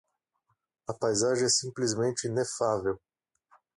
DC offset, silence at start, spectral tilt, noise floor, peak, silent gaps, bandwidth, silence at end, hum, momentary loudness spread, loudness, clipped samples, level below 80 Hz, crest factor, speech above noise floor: under 0.1%; 0.9 s; -3.5 dB/octave; -77 dBFS; -14 dBFS; none; 11.5 kHz; 0.8 s; none; 13 LU; -28 LUFS; under 0.1%; -64 dBFS; 18 dB; 49 dB